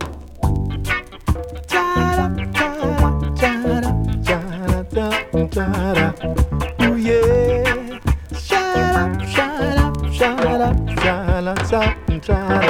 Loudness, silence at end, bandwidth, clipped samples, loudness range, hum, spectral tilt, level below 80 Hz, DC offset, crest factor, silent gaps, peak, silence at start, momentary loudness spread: -19 LUFS; 0 s; 16.5 kHz; under 0.1%; 2 LU; none; -6 dB/octave; -24 dBFS; under 0.1%; 14 dB; none; -4 dBFS; 0 s; 6 LU